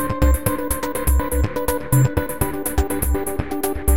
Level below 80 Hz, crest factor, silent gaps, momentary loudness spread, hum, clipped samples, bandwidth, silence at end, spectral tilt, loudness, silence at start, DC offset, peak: -24 dBFS; 16 dB; none; 6 LU; none; under 0.1%; 17 kHz; 0 s; -6 dB/octave; -21 LUFS; 0 s; 2%; -2 dBFS